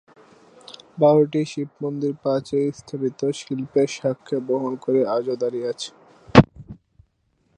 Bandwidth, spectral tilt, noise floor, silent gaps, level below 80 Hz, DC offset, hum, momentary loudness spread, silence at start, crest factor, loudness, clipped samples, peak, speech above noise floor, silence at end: 10.5 kHz; -6.5 dB/octave; -67 dBFS; none; -48 dBFS; under 0.1%; none; 13 LU; 0.7 s; 22 dB; -22 LUFS; under 0.1%; 0 dBFS; 44 dB; 0.8 s